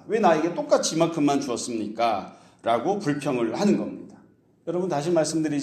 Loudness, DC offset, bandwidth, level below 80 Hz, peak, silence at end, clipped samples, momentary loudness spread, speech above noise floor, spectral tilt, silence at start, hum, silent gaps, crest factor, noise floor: -24 LUFS; under 0.1%; 13.5 kHz; -68 dBFS; -6 dBFS; 0 s; under 0.1%; 10 LU; 33 dB; -5 dB/octave; 0.05 s; none; none; 18 dB; -56 dBFS